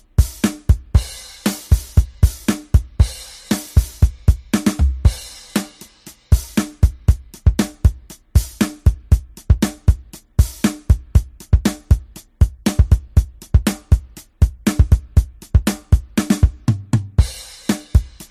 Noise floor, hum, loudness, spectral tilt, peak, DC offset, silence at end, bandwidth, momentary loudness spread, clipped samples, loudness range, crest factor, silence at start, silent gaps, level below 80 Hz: -42 dBFS; none; -19 LUFS; -6 dB/octave; 0 dBFS; under 0.1%; 0.1 s; 15.5 kHz; 7 LU; under 0.1%; 2 LU; 16 dB; 0.2 s; none; -20 dBFS